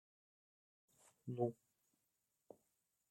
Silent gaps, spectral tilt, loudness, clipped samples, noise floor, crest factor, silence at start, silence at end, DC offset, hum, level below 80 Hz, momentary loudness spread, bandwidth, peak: none; -9.5 dB/octave; -45 LUFS; under 0.1%; -87 dBFS; 26 dB; 1.25 s; 1.6 s; under 0.1%; none; under -90 dBFS; 23 LU; 16 kHz; -26 dBFS